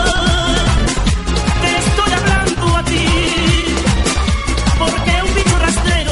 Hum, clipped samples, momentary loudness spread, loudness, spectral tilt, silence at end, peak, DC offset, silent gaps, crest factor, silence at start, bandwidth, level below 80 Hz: none; under 0.1%; 3 LU; -14 LUFS; -4 dB/octave; 0 s; 0 dBFS; under 0.1%; none; 14 dB; 0 s; 11.5 kHz; -18 dBFS